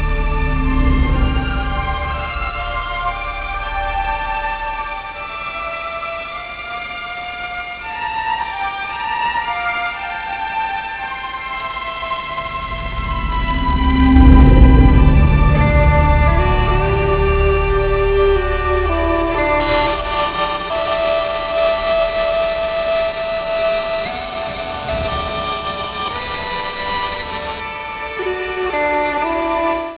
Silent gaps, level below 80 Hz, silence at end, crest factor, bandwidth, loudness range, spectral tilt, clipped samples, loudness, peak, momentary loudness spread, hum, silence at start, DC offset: none; -20 dBFS; 0 s; 16 dB; 4 kHz; 10 LU; -10.5 dB/octave; under 0.1%; -18 LUFS; 0 dBFS; 11 LU; none; 0 s; under 0.1%